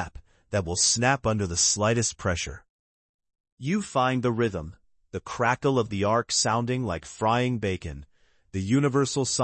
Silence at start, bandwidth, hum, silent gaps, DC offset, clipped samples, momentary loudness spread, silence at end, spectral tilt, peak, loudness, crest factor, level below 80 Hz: 0 s; 8.8 kHz; none; 2.70-3.19 s, 3.40-3.44 s, 3.52-3.57 s; under 0.1%; under 0.1%; 14 LU; 0 s; -4 dB/octave; -8 dBFS; -25 LUFS; 18 dB; -52 dBFS